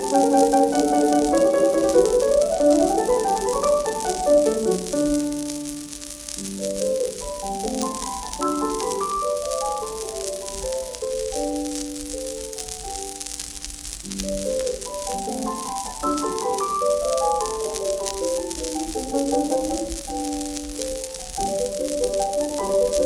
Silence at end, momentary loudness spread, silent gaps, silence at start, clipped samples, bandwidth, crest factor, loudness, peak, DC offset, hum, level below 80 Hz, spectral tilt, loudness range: 0 s; 12 LU; none; 0 s; under 0.1%; 17.5 kHz; 20 dB; -23 LUFS; -4 dBFS; under 0.1%; none; -44 dBFS; -3.5 dB/octave; 9 LU